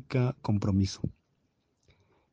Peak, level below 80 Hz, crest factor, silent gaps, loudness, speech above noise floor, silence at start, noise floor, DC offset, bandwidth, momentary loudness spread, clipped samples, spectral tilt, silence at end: -14 dBFS; -56 dBFS; 18 dB; none; -30 LUFS; 46 dB; 0.1 s; -75 dBFS; under 0.1%; 8.4 kHz; 10 LU; under 0.1%; -7 dB/octave; 1.2 s